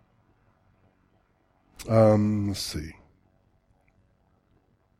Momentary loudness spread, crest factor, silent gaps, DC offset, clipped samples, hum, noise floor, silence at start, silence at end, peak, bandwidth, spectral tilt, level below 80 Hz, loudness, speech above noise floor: 21 LU; 24 dB; none; under 0.1%; under 0.1%; none; -67 dBFS; 1.8 s; 2.1 s; -6 dBFS; 14.5 kHz; -6.5 dB/octave; -52 dBFS; -24 LUFS; 44 dB